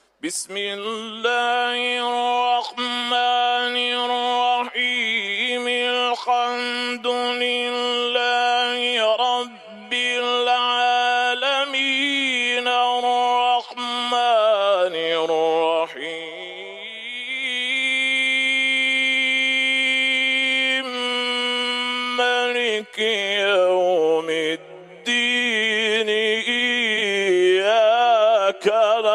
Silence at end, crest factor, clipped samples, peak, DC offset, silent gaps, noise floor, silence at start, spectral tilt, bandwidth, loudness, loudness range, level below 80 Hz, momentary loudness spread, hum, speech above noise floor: 0 s; 14 dB; under 0.1%; -6 dBFS; under 0.1%; none; -41 dBFS; 0.25 s; -1.5 dB/octave; 13 kHz; -19 LUFS; 3 LU; -78 dBFS; 8 LU; none; 19 dB